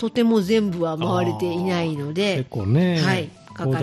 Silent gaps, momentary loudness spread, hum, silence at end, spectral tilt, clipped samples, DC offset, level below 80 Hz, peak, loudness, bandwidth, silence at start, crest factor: none; 6 LU; none; 0 s; -6.5 dB/octave; under 0.1%; under 0.1%; -56 dBFS; -8 dBFS; -22 LUFS; 13 kHz; 0 s; 14 dB